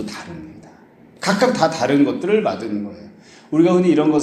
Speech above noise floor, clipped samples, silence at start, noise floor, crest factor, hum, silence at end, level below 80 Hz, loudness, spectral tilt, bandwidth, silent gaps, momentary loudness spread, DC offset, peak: 30 dB; under 0.1%; 0 s; -47 dBFS; 18 dB; none; 0 s; -60 dBFS; -18 LUFS; -6 dB/octave; 13 kHz; none; 18 LU; under 0.1%; 0 dBFS